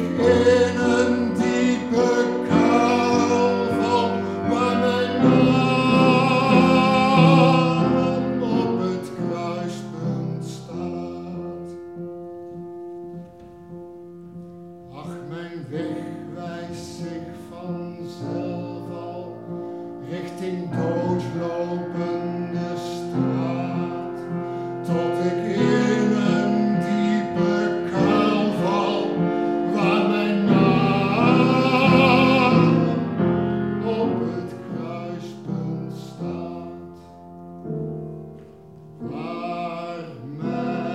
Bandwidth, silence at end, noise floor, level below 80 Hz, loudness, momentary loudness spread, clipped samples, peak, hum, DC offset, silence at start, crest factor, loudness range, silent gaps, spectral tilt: 11.5 kHz; 0 s; -44 dBFS; -56 dBFS; -21 LUFS; 19 LU; under 0.1%; -2 dBFS; none; under 0.1%; 0 s; 20 dB; 17 LU; none; -7 dB/octave